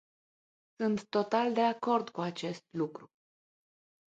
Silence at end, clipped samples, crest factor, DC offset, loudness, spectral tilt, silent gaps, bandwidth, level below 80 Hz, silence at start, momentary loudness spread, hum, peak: 1.1 s; under 0.1%; 20 dB; under 0.1%; -32 LUFS; -6 dB/octave; none; 8.8 kHz; -78 dBFS; 0.8 s; 10 LU; none; -14 dBFS